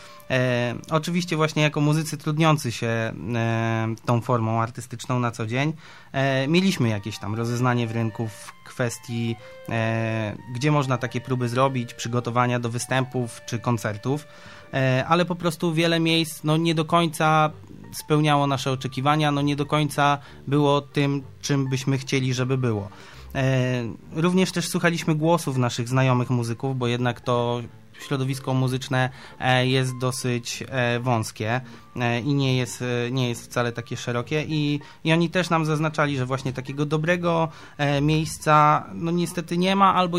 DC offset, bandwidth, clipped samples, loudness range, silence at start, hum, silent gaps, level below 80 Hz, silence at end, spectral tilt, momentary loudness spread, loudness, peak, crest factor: 0.3%; 15.5 kHz; under 0.1%; 3 LU; 0 s; none; none; -56 dBFS; 0 s; -5.5 dB/octave; 8 LU; -24 LUFS; -4 dBFS; 18 dB